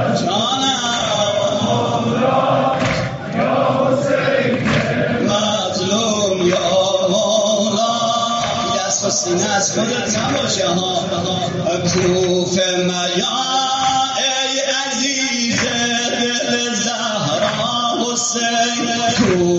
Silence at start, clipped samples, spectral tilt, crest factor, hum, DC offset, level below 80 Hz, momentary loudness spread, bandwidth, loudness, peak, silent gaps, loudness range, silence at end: 0 s; under 0.1%; -3 dB/octave; 14 dB; none; under 0.1%; -48 dBFS; 3 LU; 8 kHz; -16 LUFS; -4 dBFS; none; 1 LU; 0 s